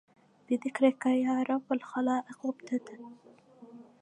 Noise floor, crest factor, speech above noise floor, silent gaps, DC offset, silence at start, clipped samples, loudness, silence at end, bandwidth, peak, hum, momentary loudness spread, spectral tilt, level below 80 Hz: -53 dBFS; 20 dB; 23 dB; none; under 0.1%; 0.5 s; under 0.1%; -31 LUFS; 0.2 s; 10 kHz; -12 dBFS; none; 13 LU; -5 dB/octave; -86 dBFS